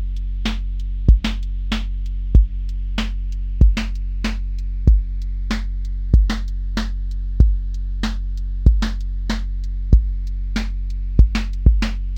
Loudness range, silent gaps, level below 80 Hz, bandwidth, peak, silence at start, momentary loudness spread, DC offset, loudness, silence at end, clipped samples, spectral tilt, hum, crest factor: 1 LU; none; -18 dBFS; 7.6 kHz; 0 dBFS; 0 s; 10 LU; under 0.1%; -22 LUFS; 0 s; under 0.1%; -6.5 dB/octave; none; 18 dB